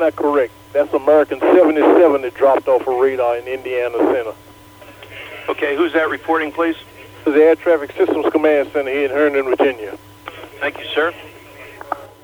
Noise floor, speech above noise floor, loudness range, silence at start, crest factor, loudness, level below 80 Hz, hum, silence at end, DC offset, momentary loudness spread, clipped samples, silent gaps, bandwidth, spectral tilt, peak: -41 dBFS; 25 dB; 6 LU; 0 s; 16 dB; -16 LUFS; -56 dBFS; 60 Hz at -55 dBFS; 0.15 s; under 0.1%; 17 LU; under 0.1%; none; over 20 kHz; -5.5 dB/octave; 0 dBFS